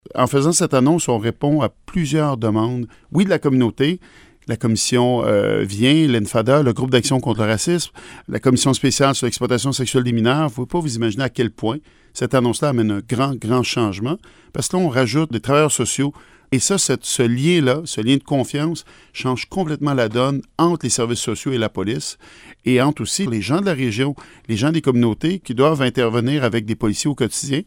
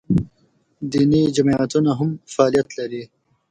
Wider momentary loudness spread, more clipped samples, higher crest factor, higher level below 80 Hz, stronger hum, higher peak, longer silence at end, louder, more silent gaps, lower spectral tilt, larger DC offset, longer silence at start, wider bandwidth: second, 8 LU vs 14 LU; neither; about the same, 18 dB vs 18 dB; about the same, -48 dBFS vs -48 dBFS; neither; about the same, 0 dBFS vs -2 dBFS; second, 0.05 s vs 0.45 s; about the same, -18 LUFS vs -19 LUFS; neither; second, -5 dB/octave vs -7 dB/octave; neither; about the same, 0.15 s vs 0.1 s; first, 17 kHz vs 9.6 kHz